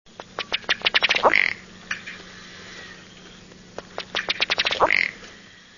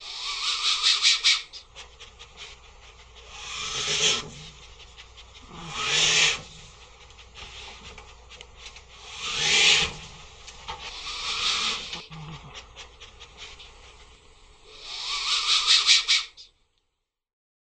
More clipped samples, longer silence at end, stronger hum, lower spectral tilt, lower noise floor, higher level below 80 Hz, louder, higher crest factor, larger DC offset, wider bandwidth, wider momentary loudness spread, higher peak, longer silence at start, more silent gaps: neither; second, 0.35 s vs 1.15 s; neither; first, -1.5 dB/octave vs 0.5 dB/octave; second, -47 dBFS vs -80 dBFS; about the same, -56 dBFS vs -52 dBFS; about the same, -21 LUFS vs -21 LUFS; about the same, 26 dB vs 24 dB; neither; second, 7.4 kHz vs 10 kHz; second, 23 LU vs 26 LU; first, 0 dBFS vs -4 dBFS; first, 0.2 s vs 0 s; neither